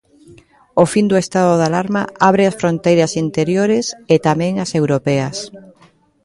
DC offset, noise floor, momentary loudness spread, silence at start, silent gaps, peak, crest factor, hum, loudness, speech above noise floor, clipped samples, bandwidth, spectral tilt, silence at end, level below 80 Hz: under 0.1%; -51 dBFS; 6 LU; 0.75 s; none; 0 dBFS; 16 dB; none; -15 LUFS; 36 dB; under 0.1%; 11.5 kHz; -6 dB/octave; 0.65 s; -54 dBFS